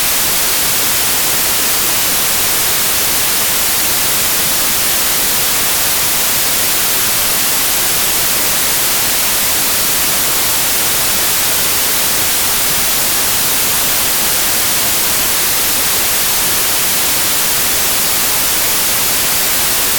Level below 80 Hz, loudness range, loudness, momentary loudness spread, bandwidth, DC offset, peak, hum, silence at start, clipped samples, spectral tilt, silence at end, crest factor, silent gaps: -38 dBFS; 0 LU; -10 LUFS; 0 LU; over 20 kHz; under 0.1%; -2 dBFS; none; 0 s; under 0.1%; 0 dB/octave; 0 s; 10 dB; none